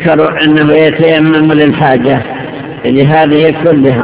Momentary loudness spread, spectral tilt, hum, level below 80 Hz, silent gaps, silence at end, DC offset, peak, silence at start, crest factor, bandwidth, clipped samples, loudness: 9 LU; -10.5 dB/octave; none; -40 dBFS; none; 0 s; 0.4%; 0 dBFS; 0 s; 8 dB; 4 kHz; 3%; -8 LUFS